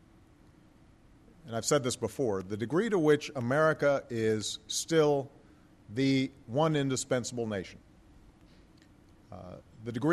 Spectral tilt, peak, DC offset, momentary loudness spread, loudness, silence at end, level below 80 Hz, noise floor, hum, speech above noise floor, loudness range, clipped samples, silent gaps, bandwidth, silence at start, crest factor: -5 dB/octave; -12 dBFS; under 0.1%; 18 LU; -30 LUFS; 0 s; -64 dBFS; -59 dBFS; none; 30 dB; 6 LU; under 0.1%; none; 13 kHz; 1.45 s; 18 dB